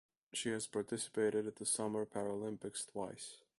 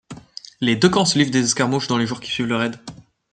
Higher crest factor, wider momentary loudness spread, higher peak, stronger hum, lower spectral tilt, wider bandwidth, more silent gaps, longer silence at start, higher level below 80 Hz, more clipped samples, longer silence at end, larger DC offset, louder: about the same, 18 dB vs 18 dB; second, 8 LU vs 21 LU; second, -24 dBFS vs -2 dBFS; neither; about the same, -3.5 dB/octave vs -4 dB/octave; first, 11.5 kHz vs 9.4 kHz; neither; first, 0.35 s vs 0.1 s; second, -78 dBFS vs -56 dBFS; neither; about the same, 0.2 s vs 0.3 s; neither; second, -40 LUFS vs -19 LUFS